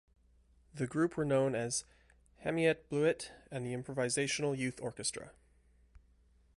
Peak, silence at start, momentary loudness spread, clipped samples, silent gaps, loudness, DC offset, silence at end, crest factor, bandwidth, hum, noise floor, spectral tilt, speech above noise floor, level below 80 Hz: -18 dBFS; 0.75 s; 11 LU; under 0.1%; none; -35 LUFS; under 0.1%; 0.6 s; 20 dB; 11.5 kHz; none; -67 dBFS; -4.5 dB/octave; 32 dB; -66 dBFS